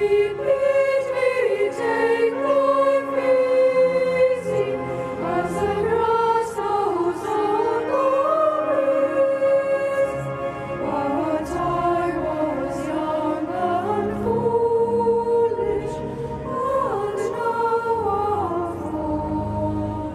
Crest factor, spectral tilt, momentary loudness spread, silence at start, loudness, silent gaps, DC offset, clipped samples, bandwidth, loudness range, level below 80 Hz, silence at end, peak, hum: 14 dB; -6.5 dB/octave; 7 LU; 0 s; -22 LUFS; none; under 0.1%; under 0.1%; 12.5 kHz; 4 LU; -46 dBFS; 0 s; -8 dBFS; none